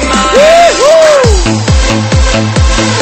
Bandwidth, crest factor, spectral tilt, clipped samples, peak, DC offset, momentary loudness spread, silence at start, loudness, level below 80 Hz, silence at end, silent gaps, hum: 13.5 kHz; 6 dB; -4.5 dB/octave; 3%; 0 dBFS; under 0.1%; 5 LU; 0 s; -6 LUFS; -14 dBFS; 0 s; none; none